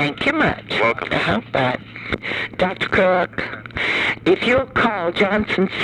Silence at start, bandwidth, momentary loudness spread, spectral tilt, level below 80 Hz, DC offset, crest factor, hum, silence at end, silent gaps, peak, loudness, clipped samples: 0 s; 11 kHz; 8 LU; -6 dB/octave; -44 dBFS; under 0.1%; 16 dB; none; 0 s; none; -4 dBFS; -19 LUFS; under 0.1%